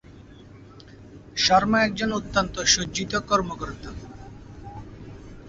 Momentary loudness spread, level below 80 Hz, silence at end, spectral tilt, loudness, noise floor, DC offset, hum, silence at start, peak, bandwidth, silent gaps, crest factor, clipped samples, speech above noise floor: 24 LU; -46 dBFS; 0 s; -2.5 dB/octave; -23 LUFS; -46 dBFS; under 0.1%; none; 0.05 s; -4 dBFS; 7.8 kHz; none; 22 dB; under 0.1%; 23 dB